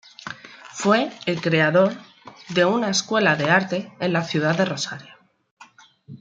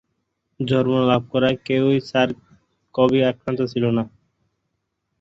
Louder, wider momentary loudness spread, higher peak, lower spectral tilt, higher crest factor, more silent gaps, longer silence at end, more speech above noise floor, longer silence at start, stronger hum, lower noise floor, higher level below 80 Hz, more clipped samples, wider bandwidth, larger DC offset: about the same, -21 LUFS vs -20 LUFS; first, 18 LU vs 10 LU; about the same, -2 dBFS vs -4 dBFS; second, -4.5 dB/octave vs -7.5 dB/octave; about the same, 20 dB vs 18 dB; first, 5.51-5.57 s vs none; second, 0.05 s vs 1.15 s; second, 30 dB vs 56 dB; second, 0.2 s vs 0.6 s; neither; second, -50 dBFS vs -75 dBFS; second, -68 dBFS vs -56 dBFS; neither; first, 9.4 kHz vs 7.6 kHz; neither